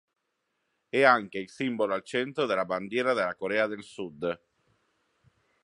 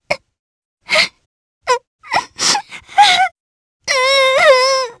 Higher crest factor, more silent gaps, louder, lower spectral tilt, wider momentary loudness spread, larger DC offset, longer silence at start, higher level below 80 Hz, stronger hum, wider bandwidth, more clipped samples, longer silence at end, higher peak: first, 24 dB vs 16 dB; second, none vs 0.39-0.77 s, 1.26-1.61 s, 1.87-1.99 s, 3.40-3.80 s; second, -28 LUFS vs -13 LUFS; first, -5 dB/octave vs 0.5 dB/octave; about the same, 13 LU vs 11 LU; neither; first, 0.95 s vs 0.1 s; second, -72 dBFS vs -56 dBFS; neither; about the same, 11 kHz vs 11 kHz; neither; first, 1.25 s vs 0.05 s; second, -6 dBFS vs 0 dBFS